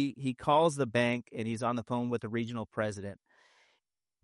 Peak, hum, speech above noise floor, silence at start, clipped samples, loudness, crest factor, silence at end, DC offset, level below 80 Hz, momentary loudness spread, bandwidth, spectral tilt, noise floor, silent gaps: -14 dBFS; none; 48 dB; 0 s; under 0.1%; -32 LUFS; 20 dB; 1.1 s; under 0.1%; -70 dBFS; 10 LU; 11.5 kHz; -6 dB/octave; -80 dBFS; none